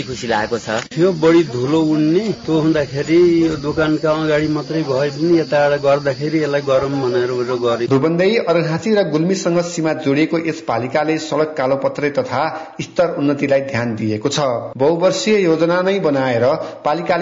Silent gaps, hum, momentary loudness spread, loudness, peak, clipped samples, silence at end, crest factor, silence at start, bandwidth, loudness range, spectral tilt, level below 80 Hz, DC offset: none; none; 6 LU; -17 LUFS; -4 dBFS; under 0.1%; 0 s; 12 dB; 0 s; 7.8 kHz; 3 LU; -6 dB/octave; -50 dBFS; under 0.1%